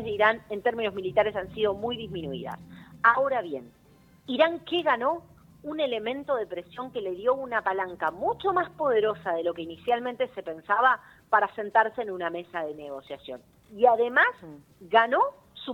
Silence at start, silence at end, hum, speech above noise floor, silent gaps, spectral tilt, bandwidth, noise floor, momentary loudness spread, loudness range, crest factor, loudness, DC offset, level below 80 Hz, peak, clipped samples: 0 s; 0 s; none; 30 dB; none; -6 dB/octave; 18 kHz; -57 dBFS; 15 LU; 3 LU; 22 dB; -27 LUFS; under 0.1%; -64 dBFS; -6 dBFS; under 0.1%